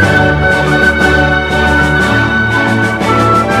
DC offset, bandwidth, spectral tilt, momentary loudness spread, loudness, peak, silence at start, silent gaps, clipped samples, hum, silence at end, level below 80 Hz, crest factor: under 0.1%; 15 kHz; -5.5 dB/octave; 2 LU; -9 LUFS; 0 dBFS; 0 s; none; under 0.1%; none; 0 s; -24 dBFS; 10 dB